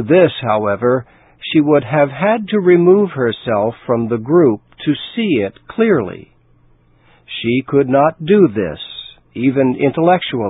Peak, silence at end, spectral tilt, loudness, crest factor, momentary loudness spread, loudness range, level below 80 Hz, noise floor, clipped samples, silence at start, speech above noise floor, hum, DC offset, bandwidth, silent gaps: 0 dBFS; 0 s; -11.5 dB/octave; -15 LUFS; 14 dB; 11 LU; 4 LU; -50 dBFS; -51 dBFS; under 0.1%; 0 s; 37 dB; none; under 0.1%; 4 kHz; none